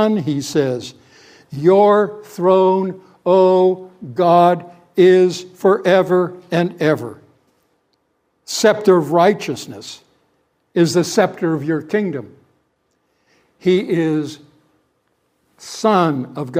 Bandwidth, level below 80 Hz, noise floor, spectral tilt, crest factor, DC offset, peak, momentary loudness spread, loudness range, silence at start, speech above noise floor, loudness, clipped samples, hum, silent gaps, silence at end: 15.5 kHz; -66 dBFS; -66 dBFS; -6 dB/octave; 18 dB; under 0.1%; 0 dBFS; 15 LU; 7 LU; 0 s; 51 dB; -16 LUFS; under 0.1%; none; none; 0 s